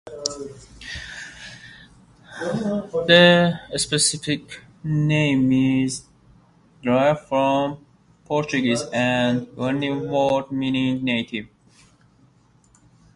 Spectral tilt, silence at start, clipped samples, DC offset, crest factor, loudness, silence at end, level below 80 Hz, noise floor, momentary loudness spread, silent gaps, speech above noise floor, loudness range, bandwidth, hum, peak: -4.5 dB/octave; 0.05 s; under 0.1%; under 0.1%; 22 dB; -21 LUFS; 1.7 s; -54 dBFS; -57 dBFS; 17 LU; none; 36 dB; 6 LU; 11.5 kHz; none; 0 dBFS